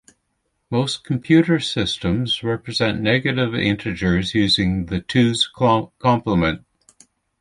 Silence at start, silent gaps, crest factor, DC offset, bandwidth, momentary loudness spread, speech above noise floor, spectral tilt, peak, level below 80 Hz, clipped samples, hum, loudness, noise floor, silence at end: 0.7 s; none; 18 dB; under 0.1%; 11.5 kHz; 6 LU; 52 dB; -5.5 dB/octave; -2 dBFS; -42 dBFS; under 0.1%; none; -19 LUFS; -71 dBFS; 0.85 s